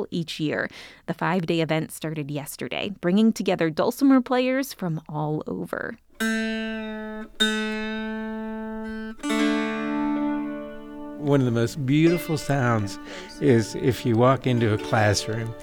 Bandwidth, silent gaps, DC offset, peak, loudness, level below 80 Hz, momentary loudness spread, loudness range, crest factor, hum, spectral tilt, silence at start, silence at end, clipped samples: 20 kHz; none; under 0.1%; -6 dBFS; -24 LUFS; -52 dBFS; 13 LU; 5 LU; 18 dB; none; -6 dB/octave; 0 s; 0 s; under 0.1%